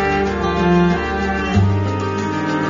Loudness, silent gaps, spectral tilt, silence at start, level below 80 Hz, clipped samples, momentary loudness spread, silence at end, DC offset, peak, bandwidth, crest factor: -18 LUFS; none; -6 dB/octave; 0 s; -32 dBFS; under 0.1%; 6 LU; 0 s; under 0.1%; -4 dBFS; 7.4 kHz; 14 dB